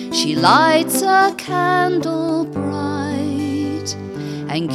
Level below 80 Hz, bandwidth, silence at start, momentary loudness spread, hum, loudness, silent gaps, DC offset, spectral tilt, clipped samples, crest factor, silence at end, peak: -60 dBFS; 16 kHz; 0 s; 12 LU; none; -17 LUFS; none; under 0.1%; -4 dB/octave; under 0.1%; 18 dB; 0 s; 0 dBFS